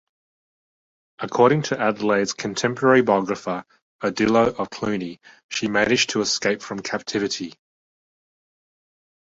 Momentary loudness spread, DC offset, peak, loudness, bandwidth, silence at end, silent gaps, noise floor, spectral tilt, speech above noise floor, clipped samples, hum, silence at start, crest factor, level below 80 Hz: 12 LU; under 0.1%; -2 dBFS; -21 LUFS; 8 kHz; 1.7 s; 3.82-3.99 s, 5.44-5.49 s; under -90 dBFS; -4 dB/octave; over 69 dB; under 0.1%; none; 1.2 s; 20 dB; -58 dBFS